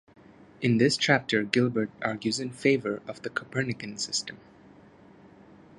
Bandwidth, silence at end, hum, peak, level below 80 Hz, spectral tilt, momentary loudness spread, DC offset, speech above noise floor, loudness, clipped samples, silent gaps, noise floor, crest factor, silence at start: 11.5 kHz; 1.4 s; none; -4 dBFS; -66 dBFS; -4.5 dB/octave; 11 LU; under 0.1%; 26 dB; -27 LUFS; under 0.1%; none; -53 dBFS; 26 dB; 0.6 s